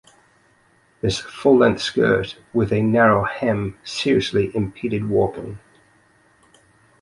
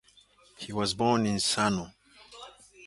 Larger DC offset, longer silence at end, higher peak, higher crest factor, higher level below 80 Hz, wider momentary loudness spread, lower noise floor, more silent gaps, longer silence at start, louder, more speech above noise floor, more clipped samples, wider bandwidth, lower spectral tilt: neither; first, 1.45 s vs 0 s; first, -2 dBFS vs -10 dBFS; about the same, 18 dB vs 20 dB; first, -48 dBFS vs -58 dBFS; second, 10 LU vs 21 LU; about the same, -58 dBFS vs -61 dBFS; neither; first, 1.05 s vs 0.6 s; first, -20 LUFS vs -28 LUFS; first, 39 dB vs 33 dB; neither; about the same, 11.5 kHz vs 11.5 kHz; first, -6 dB/octave vs -4 dB/octave